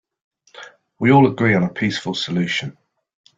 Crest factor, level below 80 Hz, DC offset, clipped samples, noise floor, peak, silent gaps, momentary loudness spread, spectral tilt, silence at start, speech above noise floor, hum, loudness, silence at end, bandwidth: 18 dB; -56 dBFS; under 0.1%; under 0.1%; -42 dBFS; -2 dBFS; none; 10 LU; -6 dB/octave; 0.55 s; 25 dB; none; -18 LUFS; 0.65 s; 7.8 kHz